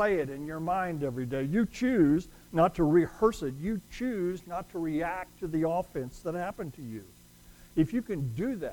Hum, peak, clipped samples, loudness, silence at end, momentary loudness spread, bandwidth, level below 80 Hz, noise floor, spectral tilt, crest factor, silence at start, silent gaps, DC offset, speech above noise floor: none; -12 dBFS; under 0.1%; -30 LUFS; 0 s; 12 LU; 19 kHz; -52 dBFS; -54 dBFS; -7.5 dB/octave; 18 dB; 0 s; none; under 0.1%; 25 dB